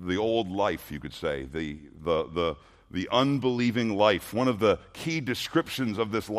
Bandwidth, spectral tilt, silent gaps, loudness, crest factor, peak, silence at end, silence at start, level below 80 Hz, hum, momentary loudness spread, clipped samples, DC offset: 15 kHz; -5.5 dB/octave; none; -28 LUFS; 20 dB; -6 dBFS; 0 s; 0 s; -54 dBFS; none; 11 LU; under 0.1%; under 0.1%